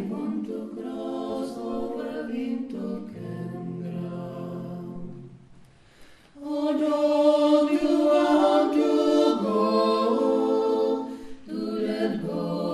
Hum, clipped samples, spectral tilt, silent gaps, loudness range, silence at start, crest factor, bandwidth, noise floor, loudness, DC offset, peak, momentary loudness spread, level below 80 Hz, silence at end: none; under 0.1%; -6.5 dB/octave; none; 14 LU; 0 s; 16 dB; 12.5 kHz; -52 dBFS; -25 LUFS; under 0.1%; -10 dBFS; 15 LU; -60 dBFS; 0 s